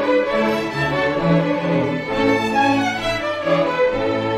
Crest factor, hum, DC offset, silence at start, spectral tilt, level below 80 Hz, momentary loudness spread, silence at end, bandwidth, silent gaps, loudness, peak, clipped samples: 14 dB; none; under 0.1%; 0 s; -6 dB/octave; -44 dBFS; 4 LU; 0 s; 14.5 kHz; none; -19 LUFS; -4 dBFS; under 0.1%